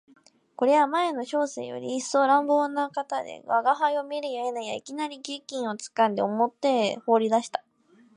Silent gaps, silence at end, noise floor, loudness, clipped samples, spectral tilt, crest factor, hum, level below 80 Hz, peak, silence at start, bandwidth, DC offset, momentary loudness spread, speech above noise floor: none; 0.55 s; -59 dBFS; -26 LUFS; under 0.1%; -4 dB/octave; 18 dB; none; -82 dBFS; -8 dBFS; 0.6 s; 11 kHz; under 0.1%; 12 LU; 34 dB